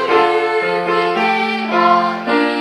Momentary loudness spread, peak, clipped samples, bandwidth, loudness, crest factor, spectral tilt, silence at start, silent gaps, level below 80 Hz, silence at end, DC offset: 3 LU; -2 dBFS; under 0.1%; 12 kHz; -15 LUFS; 14 dB; -5 dB/octave; 0 s; none; -70 dBFS; 0 s; under 0.1%